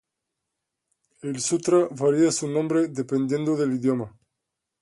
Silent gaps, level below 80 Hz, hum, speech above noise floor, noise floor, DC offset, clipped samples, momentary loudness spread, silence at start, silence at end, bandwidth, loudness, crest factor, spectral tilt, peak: none; -68 dBFS; none; 60 dB; -83 dBFS; under 0.1%; under 0.1%; 9 LU; 1.25 s; 0.75 s; 11.5 kHz; -24 LUFS; 18 dB; -5.5 dB/octave; -8 dBFS